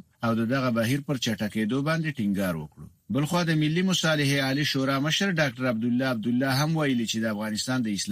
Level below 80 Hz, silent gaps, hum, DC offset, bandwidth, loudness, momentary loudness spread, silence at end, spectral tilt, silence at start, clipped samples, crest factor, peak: -60 dBFS; none; none; under 0.1%; 15.5 kHz; -26 LUFS; 5 LU; 0 s; -5 dB/octave; 0.2 s; under 0.1%; 14 dB; -10 dBFS